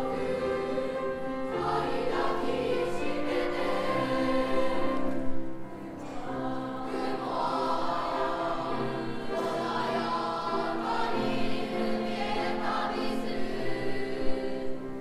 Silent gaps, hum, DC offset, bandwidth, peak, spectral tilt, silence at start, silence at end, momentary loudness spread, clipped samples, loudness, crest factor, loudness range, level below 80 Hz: none; none; under 0.1%; 12.5 kHz; -14 dBFS; -5.5 dB/octave; 0 s; 0 s; 6 LU; under 0.1%; -31 LUFS; 16 dB; 3 LU; -46 dBFS